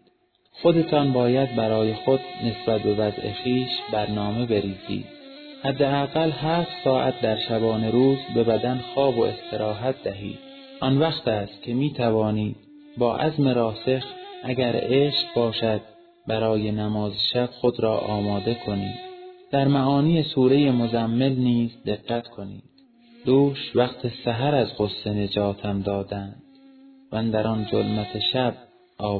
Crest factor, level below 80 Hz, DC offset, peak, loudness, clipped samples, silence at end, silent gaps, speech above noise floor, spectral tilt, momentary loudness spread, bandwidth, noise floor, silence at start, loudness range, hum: 18 dB; -54 dBFS; under 0.1%; -6 dBFS; -24 LUFS; under 0.1%; 0 s; none; 41 dB; -9.5 dB/octave; 11 LU; 4.6 kHz; -63 dBFS; 0.55 s; 4 LU; none